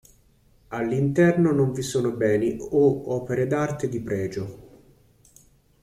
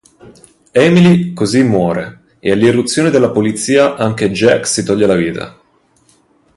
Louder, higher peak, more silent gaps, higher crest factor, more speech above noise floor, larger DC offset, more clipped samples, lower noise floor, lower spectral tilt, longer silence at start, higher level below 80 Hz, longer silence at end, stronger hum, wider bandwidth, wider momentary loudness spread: second, -23 LUFS vs -12 LUFS; second, -8 dBFS vs 0 dBFS; neither; about the same, 16 dB vs 12 dB; second, 36 dB vs 41 dB; neither; neither; first, -59 dBFS vs -53 dBFS; first, -7 dB/octave vs -5.5 dB/octave; first, 0.7 s vs 0.25 s; second, -54 dBFS vs -46 dBFS; about the same, 1.15 s vs 1.05 s; neither; first, 15 kHz vs 11.5 kHz; about the same, 11 LU vs 10 LU